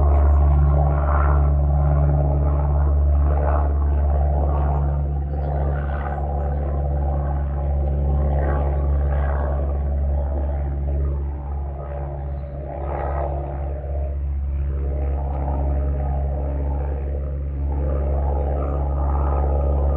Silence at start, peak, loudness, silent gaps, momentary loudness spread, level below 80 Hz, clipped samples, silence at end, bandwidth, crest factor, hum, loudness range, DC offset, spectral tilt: 0 s; -6 dBFS; -22 LUFS; none; 9 LU; -20 dBFS; under 0.1%; 0 s; 2.7 kHz; 14 dB; none; 7 LU; under 0.1%; -12.5 dB/octave